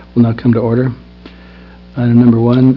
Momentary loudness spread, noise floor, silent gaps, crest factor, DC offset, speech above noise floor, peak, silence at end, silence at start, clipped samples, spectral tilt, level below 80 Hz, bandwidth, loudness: 13 LU; -36 dBFS; none; 12 dB; under 0.1%; 26 dB; 0 dBFS; 0 s; 0.15 s; 0.4%; -11.5 dB/octave; -40 dBFS; 5.2 kHz; -12 LUFS